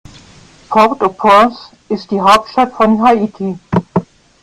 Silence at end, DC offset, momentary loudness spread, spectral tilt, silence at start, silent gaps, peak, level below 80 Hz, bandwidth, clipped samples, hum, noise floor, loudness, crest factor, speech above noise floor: 0.4 s; under 0.1%; 11 LU; -6 dB/octave; 0.7 s; none; 0 dBFS; -46 dBFS; 15 kHz; under 0.1%; none; -41 dBFS; -12 LUFS; 14 dB; 30 dB